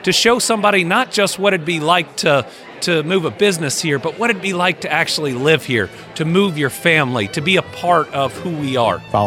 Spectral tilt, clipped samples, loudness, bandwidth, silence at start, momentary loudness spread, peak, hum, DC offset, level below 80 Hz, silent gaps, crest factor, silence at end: -4 dB/octave; under 0.1%; -16 LUFS; 16.5 kHz; 0 s; 6 LU; -2 dBFS; none; under 0.1%; -56 dBFS; none; 16 dB; 0 s